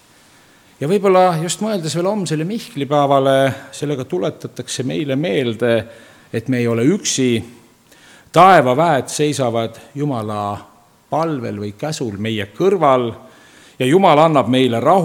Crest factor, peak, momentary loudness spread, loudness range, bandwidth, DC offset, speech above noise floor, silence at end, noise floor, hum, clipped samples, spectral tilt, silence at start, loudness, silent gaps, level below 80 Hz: 16 dB; 0 dBFS; 13 LU; 5 LU; 17.5 kHz; under 0.1%; 33 dB; 0 s; -49 dBFS; none; under 0.1%; -5 dB/octave; 0.8 s; -17 LUFS; none; -60 dBFS